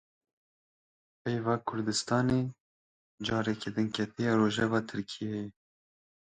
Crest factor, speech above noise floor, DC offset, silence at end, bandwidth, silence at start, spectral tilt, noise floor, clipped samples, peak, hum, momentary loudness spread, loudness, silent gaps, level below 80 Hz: 18 dB; over 59 dB; under 0.1%; 0.8 s; 9.4 kHz; 1.25 s; -5.5 dB/octave; under -90 dBFS; under 0.1%; -14 dBFS; none; 11 LU; -31 LUFS; 2.60-3.18 s; -62 dBFS